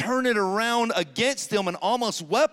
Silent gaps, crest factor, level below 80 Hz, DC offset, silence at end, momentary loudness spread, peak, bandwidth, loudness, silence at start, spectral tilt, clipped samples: none; 14 dB; -70 dBFS; under 0.1%; 0.05 s; 3 LU; -10 dBFS; 16.5 kHz; -24 LUFS; 0 s; -3 dB/octave; under 0.1%